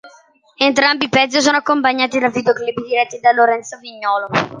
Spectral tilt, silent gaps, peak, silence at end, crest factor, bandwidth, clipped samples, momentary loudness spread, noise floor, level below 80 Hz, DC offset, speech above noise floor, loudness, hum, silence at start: -3 dB/octave; none; 0 dBFS; 0 s; 16 dB; 10 kHz; under 0.1%; 7 LU; -49 dBFS; -60 dBFS; under 0.1%; 33 dB; -15 LUFS; none; 0.05 s